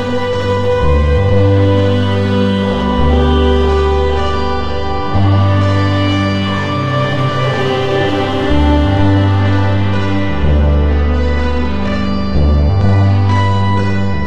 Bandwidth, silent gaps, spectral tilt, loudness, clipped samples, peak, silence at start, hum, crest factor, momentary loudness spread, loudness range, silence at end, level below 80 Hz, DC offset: 7.8 kHz; none; -7.5 dB/octave; -13 LUFS; under 0.1%; 0 dBFS; 0 s; none; 12 dB; 5 LU; 2 LU; 0 s; -18 dBFS; under 0.1%